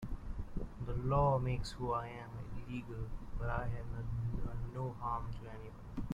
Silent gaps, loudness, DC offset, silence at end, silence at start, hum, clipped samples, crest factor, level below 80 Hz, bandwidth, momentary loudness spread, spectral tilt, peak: none; -40 LUFS; under 0.1%; 0 s; 0 s; none; under 0.1%; 18 dB; -46 dBFS; 11 kHz; 15 LU; -7.5 dB/octave; -20 dBFS